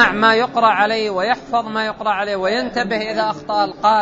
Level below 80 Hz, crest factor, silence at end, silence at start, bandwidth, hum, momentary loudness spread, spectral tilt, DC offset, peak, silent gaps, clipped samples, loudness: -50 dBFS; 18 dB; 0 s; 0 s; 8 kHz; none; 6 LU; -4.5 dB/octave; under 0.1%; 0 dBFS; none; under 0.1%; -18 LUFS